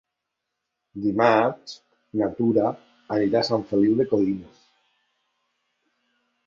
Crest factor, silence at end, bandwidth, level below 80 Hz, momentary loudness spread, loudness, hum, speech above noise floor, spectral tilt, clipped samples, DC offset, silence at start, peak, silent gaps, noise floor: 20 dB; 2 s; 7.4 kHz; -62 dBFS; 20 LU; -23 LUFS; none; 60 dB; -7 dB/octave; under 0.1%; under 0.1%; 0.95 s; -4 dBFS; none; -82 dBFS